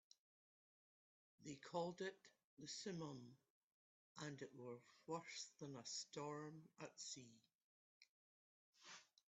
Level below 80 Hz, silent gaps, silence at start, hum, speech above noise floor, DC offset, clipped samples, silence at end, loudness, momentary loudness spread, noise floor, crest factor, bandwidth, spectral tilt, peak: under -90 dBFS; 2.45-2.57 s, 3.50-4.15 s, 7.55-8.01 s, 8.09-8.73 s; 1.4 s; none; over 36 dB; under 0.1%; under 0.1%; 0.2 s; -54 LUFS; 13 LU; under -90 dBFS; 24 dB; 8.2 kHz; -3.5 dB/octave; -34 dBFS